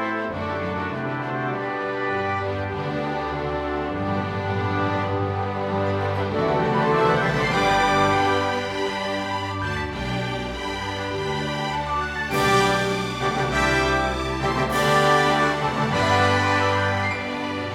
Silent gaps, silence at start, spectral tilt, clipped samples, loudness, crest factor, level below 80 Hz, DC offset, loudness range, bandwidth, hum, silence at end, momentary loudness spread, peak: none; 0 s; -5 dB/octave; under 0.1%; -23 LUFS; 16 dB; -42 dBFS; under 0.1%; 6 LU; 16 kHz; none; 0 s; 8 LU; -6 dBFS